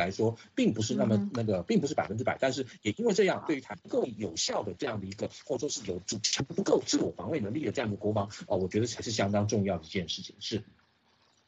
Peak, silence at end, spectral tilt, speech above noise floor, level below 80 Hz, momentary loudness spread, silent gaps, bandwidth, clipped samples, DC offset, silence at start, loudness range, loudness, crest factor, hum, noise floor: -12 dBFS; 0.85 s; -4.5 dB/octave; 37 dB; -64 dBFS; 8 LU; none; 8.4 kHz; under 0.1%; under 0.1%; 0 s; 3 LU; -31 LUFS; 18 dB; none; -68 dBFS